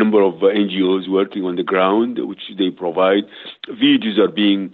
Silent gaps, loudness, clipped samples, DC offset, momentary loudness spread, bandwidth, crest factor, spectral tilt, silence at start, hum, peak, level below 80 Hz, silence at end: none; -17 LUFS; under 0.1%; under 0.1%; 10 LU; 4.3 kHz; 14 dB; -8.5 dB/octave; 0 s; none; -4 dBFS; -64 dBFS; 0.05 s